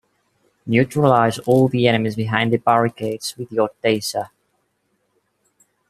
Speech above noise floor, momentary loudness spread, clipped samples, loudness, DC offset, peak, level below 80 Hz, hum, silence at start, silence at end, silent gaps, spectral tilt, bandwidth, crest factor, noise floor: 51 dB; 10 LU; under 0.1%; -19 LUFS; under 0.1%; 0 dBFS; -58 dBFS; none; 0.65 s; 1.65 s; none; -6 dB/octave; 15 kHz; 20 dB; -69 dBFS